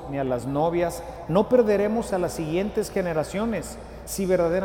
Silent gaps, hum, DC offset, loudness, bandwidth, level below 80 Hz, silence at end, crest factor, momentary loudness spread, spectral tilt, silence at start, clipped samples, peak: none; none; under 0.1%; -25 LUFS; 17 kHz; -44 dBFS; 0 s; 16 dB; 11 LU; -6 dB/octave; 0 s; under 0.1%; -8 dBFS